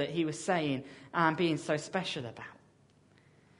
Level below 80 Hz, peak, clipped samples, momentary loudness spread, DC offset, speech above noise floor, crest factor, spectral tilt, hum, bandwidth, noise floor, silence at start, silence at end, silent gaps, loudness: -72 dBFS; -12 dBFS; under 0.1%; 14 LU; under 0.1%; 31 dB; 22 dB; -5 dB/octave; none; 10.5 kHz; -64 dBFS; 0 s; 1.05 s; none; -32 LUFS